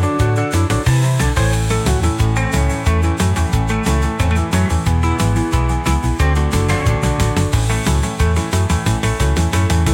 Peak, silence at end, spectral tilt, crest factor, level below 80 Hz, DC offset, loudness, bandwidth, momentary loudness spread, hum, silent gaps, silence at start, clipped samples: -4 dBFS; 0 s; -5.5 dB/octave; 12 dB; -22 dBFS; under 0.1%; -17 LUFS; 17 kHz; 2 LU; none; none; 0 s; under 0.1%